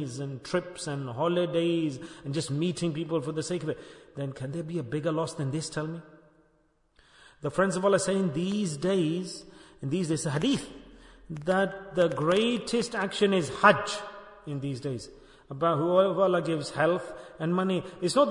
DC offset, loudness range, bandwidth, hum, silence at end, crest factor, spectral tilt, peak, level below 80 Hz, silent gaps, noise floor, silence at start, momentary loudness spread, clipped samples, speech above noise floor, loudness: under 0.1%; 6 LU; 11 kHz; none; 0 s; 24 dB; -5.5 dB/octave; -6 dBFS; -62 dBFS; none; -68 dBFS; 0 s; 14 LU; under 0.1%; 40 dB; -28 LUFS